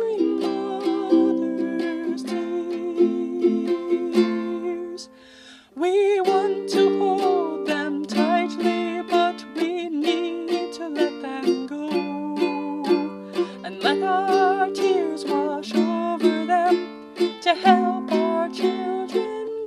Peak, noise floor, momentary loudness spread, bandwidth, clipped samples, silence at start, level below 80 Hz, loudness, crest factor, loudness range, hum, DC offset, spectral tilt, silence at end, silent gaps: -4 dBFS; -47 dBFS; 8 LU; 12 kHz; under 0.1%; 0 s; -70 dBFS; -23 LUFS; 18 dB; 4 LU; none; under 0.1%; -5 dB/octave; 0 s; none